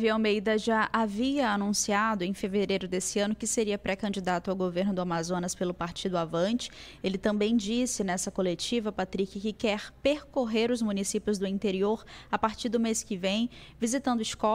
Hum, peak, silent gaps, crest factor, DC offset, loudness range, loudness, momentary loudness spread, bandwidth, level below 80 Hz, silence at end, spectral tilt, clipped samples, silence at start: none; -12 dBFS; none; 18 dB; under 0.1%; 2 LU; -29 LUFS; 5 LU; 15.5 kHz; -56 dBFS; 0 s; -4 dB/octave; under 0.1%; 0 s